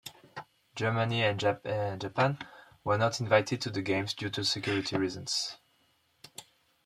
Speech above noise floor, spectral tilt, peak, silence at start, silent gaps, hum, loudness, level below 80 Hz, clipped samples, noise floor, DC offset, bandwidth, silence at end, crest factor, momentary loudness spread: 40 dB; -4.5 dB/octave; -10 dBFS; 0.05 s; none; none; -30 LUFS; -68 dBFS; under 0.1%; -70 dBFS; under 0.1%; 14.5 kHz; 0.45 s; 22 dB; 20 LU